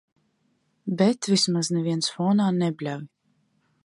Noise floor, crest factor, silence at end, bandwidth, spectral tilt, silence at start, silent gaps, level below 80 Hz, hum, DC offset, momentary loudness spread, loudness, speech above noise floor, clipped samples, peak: -70 dBFS; 18 dB; 0.8 s; 11.5 kHz; -5 dB/octave; 0.85 s; none; -74 dBFS; none; under 0.1%; 11 LU; -24 LUFS; 46 dB; under 0.1%; -8 dBFS